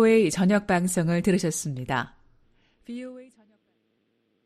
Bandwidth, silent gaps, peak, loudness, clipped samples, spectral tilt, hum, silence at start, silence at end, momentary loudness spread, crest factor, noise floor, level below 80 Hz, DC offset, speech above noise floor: 14.5 kHz; none; -10 dBFS; -24 LUFS; under 0.1%; -5.5 dB/octave; none; 0 s; 1.2 s; 18 LU; 16 dB; -71 dBFS; -56 dBFS; under 0.1%; 48 dB